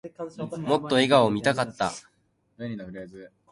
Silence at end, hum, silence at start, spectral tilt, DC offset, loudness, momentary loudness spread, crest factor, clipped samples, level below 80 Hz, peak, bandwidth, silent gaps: 0.25 s; none; 0.05 s; -5 dB/octave; under 0.1%; -24 LUFS; 20 LU; 22 dB; under 0.1%; -62 dBFS; -4 dBFS; 11.5 kHz; none